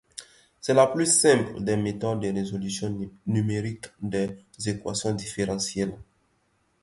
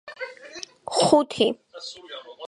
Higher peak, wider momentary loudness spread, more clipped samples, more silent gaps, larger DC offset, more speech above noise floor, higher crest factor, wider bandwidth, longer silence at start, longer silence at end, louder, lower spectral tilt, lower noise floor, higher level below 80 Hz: second, -6 dBFS vs -2 dBFS; second, 14 LU vs 20 LU; neither; neither; neither; first, 43 dB vs 19 dB; about the same, 22 dB vs 22 dB; about the same, 11.5 kHz vs 11.5 kHz; about the same, 0.15 s vs 0.05 s; first, 0.8 s vs 0 s; second, -26 LUFS vs -21 LUFS; about the same, -4.5 dB/octave vs -3.5 dB/octave; first, -69 dBFS vs -42 dBFS; first, -56 dBFS vs -66 dBFS